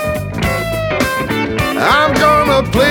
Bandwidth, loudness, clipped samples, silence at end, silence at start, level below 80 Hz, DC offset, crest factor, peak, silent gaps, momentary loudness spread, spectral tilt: 19 kHz; -13 LUFS; under 0.1%; 0 s; 0 s; -30 dBFS; under 0.1%; 14 dB; 0 dBFS; none; 7 LU; -5 dB/octave